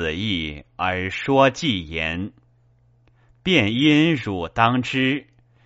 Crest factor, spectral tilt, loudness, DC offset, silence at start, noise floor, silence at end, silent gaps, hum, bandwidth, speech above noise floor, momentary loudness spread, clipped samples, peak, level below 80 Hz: 20 dB; -3.5 dB/octave; -21 LUFS; under 0.1%; 0 s; -58 dBFS; 0.45 s; none; none; 8 kHz; 37 dB; 11 LU; under 0.1%; -2 dBFS; -48 dBFS